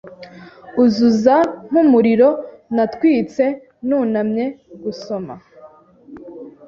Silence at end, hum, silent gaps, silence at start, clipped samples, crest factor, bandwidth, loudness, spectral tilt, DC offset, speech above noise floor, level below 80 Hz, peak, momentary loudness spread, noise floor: 0.15 s; none; none; 0.05 s; under 0.1%; 16 dB; 7.2 kHz; -16 LUFS; -7 dB/octave; under 0.1%; 29 dB; -58 dBFS; 0 dBFS; 17 LU; -45 dBFS